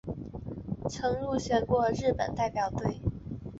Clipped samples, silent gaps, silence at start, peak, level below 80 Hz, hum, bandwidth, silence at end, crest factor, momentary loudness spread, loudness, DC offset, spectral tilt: under 0.1%; none; 0.05 s; -14 dBFS; -46 dBFS; none; 8 kHz; 0 s; 16 dB; 13 LU; -31 LUFS; under 0.1%; -6.5 dB/octave